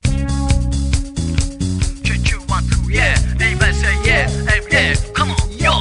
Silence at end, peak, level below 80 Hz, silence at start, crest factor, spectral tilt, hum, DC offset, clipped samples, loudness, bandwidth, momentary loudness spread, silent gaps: 0 s; 0 dBFS; -20 dBFS; 0.05 s; 16 dB; -4.5 dB/octave; none; under 0.1%; under 0.1%; -16 LUFS; 10.5 kHz; 6 LU; none